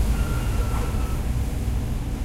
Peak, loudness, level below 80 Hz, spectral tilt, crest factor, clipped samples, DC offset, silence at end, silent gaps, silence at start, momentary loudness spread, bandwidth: -12 dBFS; -27 LUFS; -26 dBFS; -6 dB/octave; 12 dB; under 0.1%; under 0.1%; 0 s; none; 0 s; 2 LU; 16 kHz